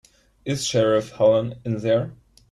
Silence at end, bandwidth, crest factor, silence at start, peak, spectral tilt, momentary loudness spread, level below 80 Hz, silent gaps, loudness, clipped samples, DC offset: 0.35 s; 12.5 kHz; 16 dB; 0.45 s; -6 dBFS; -5.5 dB/octave; 11 LU; -56 dBFS; none; -22 LUFS; under 0.1%; under 0.1%